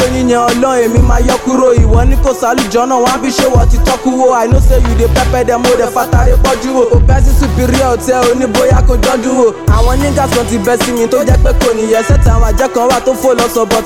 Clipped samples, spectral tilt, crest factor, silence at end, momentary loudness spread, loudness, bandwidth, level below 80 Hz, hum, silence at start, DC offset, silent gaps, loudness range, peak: under 0.1%; -5.5 dB/octave; 8 dB; 0 s; 2 LU; -10 LUFS; 16.5 kHz; -12 dBFS; none; 0 s; 0.5%; none; 1 LU; 0 dBFS